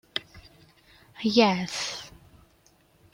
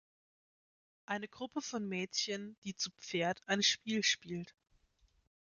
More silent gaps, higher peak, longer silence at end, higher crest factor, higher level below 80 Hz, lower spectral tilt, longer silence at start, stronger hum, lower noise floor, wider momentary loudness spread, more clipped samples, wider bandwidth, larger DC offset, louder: second, none vs 2.58-2.62 s; first, -6 dBFS vs -18 dBFS; about the same, 1.05 s vs 1.05 s; about the same, 24 dB vs 22 dB; first, -62 dBFS vs -78 dBFS; first, -4 dB/octave vs -2.5 dB/octave; second, 0.15 s vs 1.1 s; neither; second, -62 dBFS vs -73 dBFS; first, 17 LU vs 13 LU; neither; first, 16.5 kHz vs 10 kHz; neither; first, -26 LUFS vs -36 LUFS